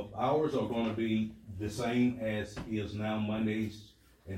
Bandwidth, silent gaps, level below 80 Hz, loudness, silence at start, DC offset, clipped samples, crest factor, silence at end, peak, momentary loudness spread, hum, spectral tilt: 14 kHz; none; -60 dBFS; -33 LUFS; 0 s; under 0.1%; under 0.1%; 14 dB; 0 s; -18 dBFS; 9 LU; none; -6.5 dB/octave